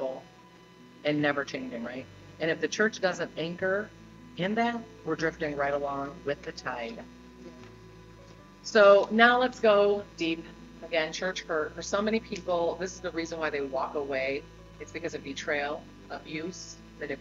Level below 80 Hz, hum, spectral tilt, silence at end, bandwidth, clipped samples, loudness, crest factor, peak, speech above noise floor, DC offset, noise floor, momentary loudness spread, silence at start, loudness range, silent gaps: -58 dBFS; none; -4.5 dB/octave; 0 s; 7.8 kHz; under 0.1%; -29 LUFS; 24 dB; -6 dBFS; 25 dB; under 0.1%; -54 dBFS; 21 LU; 0 s; 10 LU; none